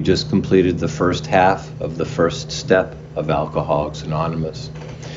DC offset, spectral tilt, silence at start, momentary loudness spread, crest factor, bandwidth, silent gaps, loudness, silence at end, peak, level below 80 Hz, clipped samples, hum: under 0.1%; -6 dB/octave; 0 s; 11 LU; 18 dB; 7.6 kHz; none; -19 LUFS; 0 s; -2 dBFS; -40 dBFS; under 0.1%; none